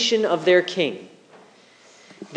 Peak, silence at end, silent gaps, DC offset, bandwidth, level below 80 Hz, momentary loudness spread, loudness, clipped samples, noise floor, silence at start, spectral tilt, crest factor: -4 dBFS; 0 s; none; under 0.1%; 9.4 kHz; -86 dBFS; 21 LU; -20 LUFS; under 0.1%; -52 dBFS; 0 s; -3.5 dB/octave; 18 dB